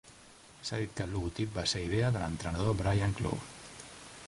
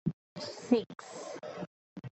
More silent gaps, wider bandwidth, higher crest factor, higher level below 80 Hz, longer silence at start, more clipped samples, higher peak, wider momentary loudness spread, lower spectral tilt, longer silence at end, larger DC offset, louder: second, none vs 0.13-0.36 s, 1.67-1.96 s; first, 11.5 kHz vs 8.4 kHz; second, 18 dB vs 24 dB; first, -48 dBFS vs -70 dBFS; about the same, 0.05 s vs 0.05 s; neither; second, -16 dBFS vs -12 dBFS; about the same, 17 LU vs 15 LU; about the same, -5.5 dB/octave vs -6 dB/octave; about the same, 0 s vs 0.05 s; neither; first, -34 LUFS vs -37 LUFS